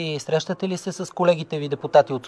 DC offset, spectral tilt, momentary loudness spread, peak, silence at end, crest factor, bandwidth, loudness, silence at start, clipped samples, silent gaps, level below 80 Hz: under 0.1%; -5.5 dB/octave; 9 LU; -4 dBFS; 0 s; 18 dB; 11 kHz; -23 LUFS; 0 s; under 0.1%; none; -70 dBFS